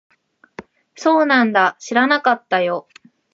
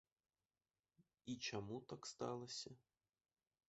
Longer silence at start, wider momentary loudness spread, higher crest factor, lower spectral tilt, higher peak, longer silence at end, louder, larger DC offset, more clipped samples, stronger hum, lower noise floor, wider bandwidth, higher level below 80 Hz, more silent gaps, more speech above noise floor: second, 0.6 s vs 1.25 s; second, 8 LU vs 11 LU; second, 16 dB vs 22 dB; about the same, -4 dB/octave vs -4 dB/octave; first, -2 dBFS vs -32 dBFS; second, 0.5 s vs 0.9 s; first, -17 LUFS vs -50 LUFS; neither; neither; neither; second, -40 dBFS vs under -90 dBFS; about the same, 7.8 kHz vs 8 kHz; first, -70 dBFS vs -82 dBFS; neither; second, 24 dB vs over 40 dB